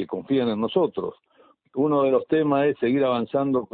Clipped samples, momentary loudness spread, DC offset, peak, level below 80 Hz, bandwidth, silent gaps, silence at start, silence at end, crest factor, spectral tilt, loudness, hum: under 0.1%; 5 LU; under 0.1%; -8 dBFS; -66 dBFS; 4.6 kHz; none; 0 s; 0.1 s; 14 dB; -11.5 dB/octave; -23 LUFS; none